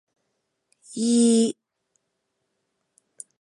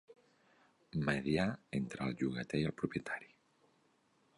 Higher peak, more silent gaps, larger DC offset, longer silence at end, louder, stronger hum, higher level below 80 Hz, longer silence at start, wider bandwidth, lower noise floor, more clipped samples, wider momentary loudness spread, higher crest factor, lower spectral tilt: first, -8 dBFS vs -18 dBFS; neither; neither; first, 1.9 s vs 1.1 s; first, -21 LUFS vs -38 LUFS; neither; second, -76 dBFS vs -64 dBFS; first, 0.9 s vs 0.1 s; about the same, 11.5 kHz vs 11 kHz; about the same, -77 dBFS vs -74 dBFS; neither; first, 20 LU vs 8 LU; about the same, 18 dB vs 20 dB; second, -4.5 dB/octave vs -6.5 dB/octave